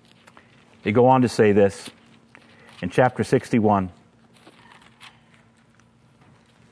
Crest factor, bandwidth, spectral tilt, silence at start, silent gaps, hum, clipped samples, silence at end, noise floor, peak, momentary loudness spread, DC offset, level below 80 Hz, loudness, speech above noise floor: 20 dB; 11 kHz; -7 dB/octave; 0.85 s; none; none; under 0.1%; 2.8 s; -57 dBFS; -4 dBFS; 17 LU; under 0.1%; -62 dBFS; -20 LUFS; 38 dB